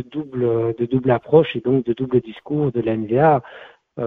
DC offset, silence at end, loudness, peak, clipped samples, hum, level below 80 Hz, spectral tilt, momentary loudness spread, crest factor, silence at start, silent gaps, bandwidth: under 0.1%; 0 s; -19 LUFS; 0 dBFS; under 0.1%; none; -54 dBFS; -10.5 dB/octave; 7 LU; 18 dB; 0 s; none; 4 kHz